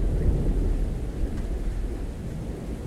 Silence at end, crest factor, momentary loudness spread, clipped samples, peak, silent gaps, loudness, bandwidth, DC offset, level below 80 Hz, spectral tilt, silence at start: 0 s; 14 dB; 8 LU; under 0.1%; -12 dBFS; none; -30 LUFS; 11.5 kHz; under 0.1%; -28 dBFS; -8 dB/octave; 0 s